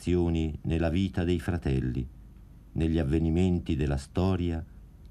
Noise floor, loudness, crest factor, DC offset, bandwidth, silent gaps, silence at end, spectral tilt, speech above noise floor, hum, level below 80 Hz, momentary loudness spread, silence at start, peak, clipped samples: -50 dBFS; -29 LUFS; 14 dB; under 0.1%; 11.5 kHz; none; 0 s; -8 dB/octave; 22 dB; none; -38 dBFS; 9 LU; 0 s; -14 dBFS; under 0.1%